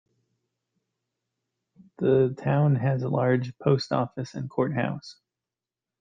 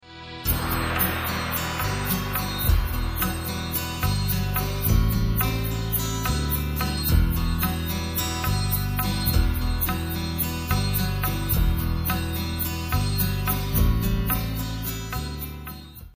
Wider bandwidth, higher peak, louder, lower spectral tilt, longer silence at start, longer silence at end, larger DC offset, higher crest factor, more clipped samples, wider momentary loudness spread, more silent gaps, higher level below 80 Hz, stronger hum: second, 7.4 kHz vs 15.5 kHz; about the same, -8 dBFS vs -8 dBFS; about the same, -25 LUFS vs -25 LUFS; first, -8 dB/octave vs -4.5 dB/octave; first, 2 s vs 0.05 s; first, 0.9 s vs 0.05 s; neither; about the same, 20 dB vs 16 dB; neither; first, 9 LU vs 6 LU; neither; second, -64 dBFS vs -28 dBFS; neither